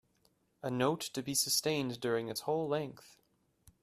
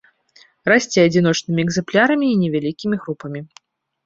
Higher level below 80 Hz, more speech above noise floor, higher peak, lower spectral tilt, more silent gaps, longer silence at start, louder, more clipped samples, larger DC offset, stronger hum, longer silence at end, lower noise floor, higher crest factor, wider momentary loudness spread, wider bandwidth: second, -74 dBFS vs -56 dBFS; about the same, 39 dB vs 36 dB; second, -16 dBFS vs -2 dBFS; second, -3.5 dB/octave vs -5.5 dB/octave; neither; about the same, 0.65 s vs 0.65 s; second, -34 LUFS vs -18 LUFS; neither; neither; neither; first, 0.75 s vs 0.6 s; first, -74 dBFS vs -53 dBFS; about the same, 20 dB vs 18 dB; second, 9 LU vs 14 LU; first, 15 kHz vs 7.8 kHz